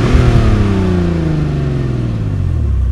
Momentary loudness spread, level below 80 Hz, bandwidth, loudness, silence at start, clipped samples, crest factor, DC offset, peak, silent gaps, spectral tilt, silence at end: 6 LU; -18 dBFS; 10.5 kHz; -14 LUFS; 0 s; 0.1%; 12 dB; under 0.1%; 0 dBFS; none; -8 dB/octave; 0 s